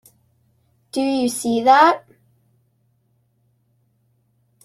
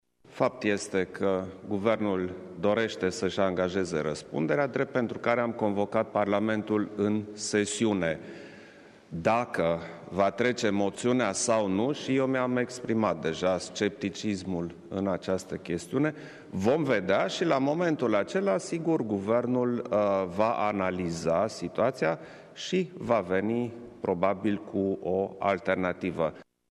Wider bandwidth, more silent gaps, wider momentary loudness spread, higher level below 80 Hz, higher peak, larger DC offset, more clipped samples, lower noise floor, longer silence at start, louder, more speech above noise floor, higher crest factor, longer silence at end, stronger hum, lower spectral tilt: first, 14.5 kHz vs 12 kHz; neither; first, 14 LU vs 6 LU; about the same, -66 dBFS vs -64 dBFS; first, -2 dBFS vs -10 dBFS; neither; neither; first, -65 dBFS vs -52 dBFS; first, 0.95 s vs 0.3 s; first, -17 LUFS vs -29 LUFS; first, 49 dB vs 24 dB; about the same, 20 dB vs 20 dB; first, 2.65 s vs 0.3 s; neither; second, -3 dB/octave vs -5.5 dB/octave